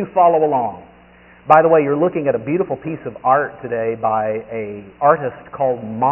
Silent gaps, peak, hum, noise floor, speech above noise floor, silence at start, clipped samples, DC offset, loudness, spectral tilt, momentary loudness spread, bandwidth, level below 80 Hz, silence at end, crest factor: none; 0 dBFS; none; -46 dBFS; 29 dB; 0 s; under 0.1%; under 0.1%; -17 LUFS; -2 dB/octave; 14 LU; 3.4 kHz; -56 dBFS; 0 s; 18 dB